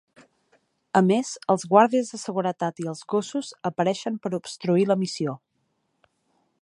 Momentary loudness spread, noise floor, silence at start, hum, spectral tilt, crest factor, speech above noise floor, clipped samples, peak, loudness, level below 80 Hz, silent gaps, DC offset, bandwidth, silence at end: 12 LU; -73 dBFS; 0.95 s; none; -5.5 dB/octave; 22 dB; 49 dB; under 0.1%; -4 dBFS; -24 LUFS; -74 dBFS; none; under 0.1%; 11.5 kHz; 1.25 s